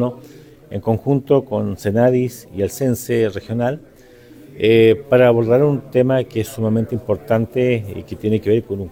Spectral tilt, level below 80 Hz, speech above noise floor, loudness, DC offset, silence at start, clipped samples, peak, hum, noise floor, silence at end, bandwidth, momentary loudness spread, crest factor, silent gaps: -7 dB/octave; -48 dBFS; 27 dB; -18 LUFS; under 0.1%; 0 s; under 0.1%; -2 dBFS; none; -44 dBFS; 0 s; 17 kHz; 11 LU; 16 dB; none